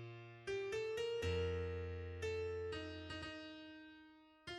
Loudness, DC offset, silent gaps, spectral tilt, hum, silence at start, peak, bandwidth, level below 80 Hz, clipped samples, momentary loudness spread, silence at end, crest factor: -44 LUFS; under 0.1%; none; -5.5 dB/octave; none; 0 s; -30 dBFS; 12.5 kHz; -60 dBFS; under 0.1%; 16 LU; 0 s; 16 dB